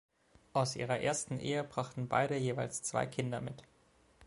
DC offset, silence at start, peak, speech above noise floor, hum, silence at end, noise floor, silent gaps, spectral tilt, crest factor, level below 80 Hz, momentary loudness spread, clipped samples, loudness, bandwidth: under 0.1%; 0.55 s; -16 dBFS; 31 dB; none; 0 s; -67 dBFS; none; -4.5 dB/octave; 22 dB; -68 dBFS; 6 LU; under 0.1%; -36 LUFS; 11.5 kHz